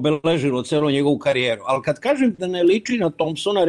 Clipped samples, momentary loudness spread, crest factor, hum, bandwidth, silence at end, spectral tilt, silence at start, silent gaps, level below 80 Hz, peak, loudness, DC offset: under 0.1%; 4 LU; 12 dB; none; 11.5 kHz; 0 s; -5.5 dB/octave; 0 s; none; -58 dBFS; -8 dBFS; -20 LUFS; under 0.1%